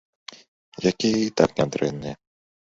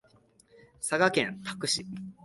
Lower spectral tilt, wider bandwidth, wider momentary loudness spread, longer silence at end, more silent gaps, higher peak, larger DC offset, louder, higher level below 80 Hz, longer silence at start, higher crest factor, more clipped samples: first, -5 dB/octave vs -3 dB/octave; second, 8 kHz vs 12 kHz; first, 21 LU vs 11 LU; first, 0.5 s vs 0.1 s; first, 0.48-0.72 s vs none; first, -2 dBFS vs -10 dBFS; neither; first, -23 LUFS vs -29 LUFS; first, -56 dBFS vs -68 dBFS; second, 0.3 s vs 0.8 s; about the same, 24 dB vs 22 dB; neither